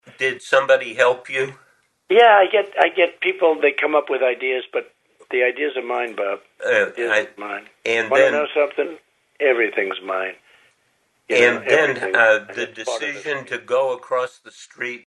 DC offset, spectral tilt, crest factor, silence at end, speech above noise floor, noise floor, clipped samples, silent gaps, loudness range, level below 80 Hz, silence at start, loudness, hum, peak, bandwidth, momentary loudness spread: under 0.1%; -3 dB/octave; 20 dB; 0.1 s; 46 dB; -65 dBFS; under 0.1%; none; 5 LU; -72 dBFS; 0.2 s; -19 LUFS; none; 0 dBFS; 11 kHz; 12 LU